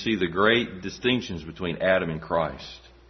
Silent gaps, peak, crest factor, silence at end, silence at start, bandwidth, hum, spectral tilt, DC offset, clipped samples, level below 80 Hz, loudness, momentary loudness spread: none; -6 dBFS; 20 dB; 0.2 s; 0 s; 6.4 kHz; none; -5.5 dB/octave; under 0.1%; under 0.1%; -52 dBFS; -25 LUFS; 13 LU